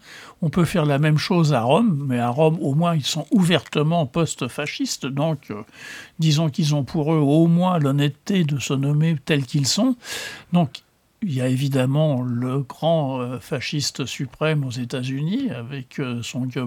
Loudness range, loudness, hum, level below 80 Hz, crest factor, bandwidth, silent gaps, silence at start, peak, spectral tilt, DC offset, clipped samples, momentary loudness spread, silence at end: 5 LU; -21 LUFS; none; -56 dBFS; 18 dB; 15.5 kHz; none; 0.05 s; -2 dBFS; -6 dB/octave; under 0.1%; under 0.1%; 10 LU; 0 s